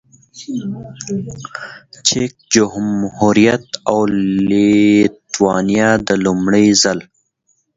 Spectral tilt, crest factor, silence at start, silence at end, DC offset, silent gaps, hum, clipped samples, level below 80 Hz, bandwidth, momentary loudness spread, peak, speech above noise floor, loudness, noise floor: -4.5 dB/octave; 16 dB; 0.35 s; 0.75 s; under 0.1%; none; none; under 0.1%; -48 dBFS; 8 kHz; 16 LU; 0 dBFS; 49 dB; -14 LUFS; -63 dBFS